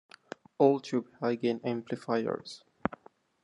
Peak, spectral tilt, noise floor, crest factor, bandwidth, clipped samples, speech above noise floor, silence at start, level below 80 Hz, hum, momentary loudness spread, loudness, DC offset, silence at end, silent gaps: -8 dBFS; -6.5 dB/octave; -53 dBFS; 24 dB; 11 kHz; under 0.1%; 23 dB; 0.6 s; -68 dBFS; none; 22 LU; -31 LUFS; under 0.1%; 0.5 s; none